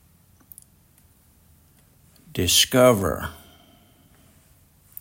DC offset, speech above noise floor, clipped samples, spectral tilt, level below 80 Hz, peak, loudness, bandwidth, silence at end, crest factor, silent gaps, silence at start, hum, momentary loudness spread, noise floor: under 0.1%; 38 dB; under 0.1%; -3 dB/octave; -52 dBFS; -4 dBFS; -19 LUFS; 16.5 kHz; 1.65 s; 22 dB; none; 2.35 s; none; 20 LU; -57 dBFS